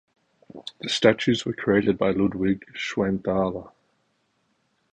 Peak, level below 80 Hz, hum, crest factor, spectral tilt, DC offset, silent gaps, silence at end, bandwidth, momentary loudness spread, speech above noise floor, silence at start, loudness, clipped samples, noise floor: -2 dBFS; -54 dBFS; none; 22 dB; -5.5 dB/octave; under 0.1%; none; 1.25 s; 9.8 kHz; 14 LU; 47 dB; 0.55 s; -24 LUFS; under 0.1%; -70 dBFS